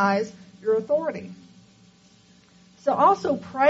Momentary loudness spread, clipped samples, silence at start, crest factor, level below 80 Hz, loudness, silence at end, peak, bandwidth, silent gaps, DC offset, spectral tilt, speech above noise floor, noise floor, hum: 15 LU; under 0.1%; 0 s; 18 dB; -68 dBFS; -24 LUFS; 0 s; -6 dBFS; 8 kHz; none; under 0.1%; -4.5 dB/octave; 33 dB; -55 dBFS; none